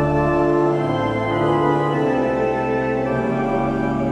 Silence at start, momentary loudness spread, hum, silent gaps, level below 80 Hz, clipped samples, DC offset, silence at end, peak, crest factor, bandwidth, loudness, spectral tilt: 0 s; 3 LU; none; none; -40 dBFS; under 0.1%; under 0.1%; 0 s; -6 dBFS; 12 dB; 9.8 kHz; -19 LUFS; -8 dB/octave